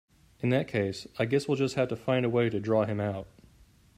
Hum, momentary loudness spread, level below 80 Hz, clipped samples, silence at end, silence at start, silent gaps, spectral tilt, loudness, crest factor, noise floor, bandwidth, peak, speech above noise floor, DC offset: none; 7 LU; -62 dBFS; under 0.1%; 0.7 s; 0.4 s; none; -7 dB/octave; -29 LUFS; 16 dB; -59 dBFS; 14 kHz; -14 dBFS; 31 dB; under 0.1%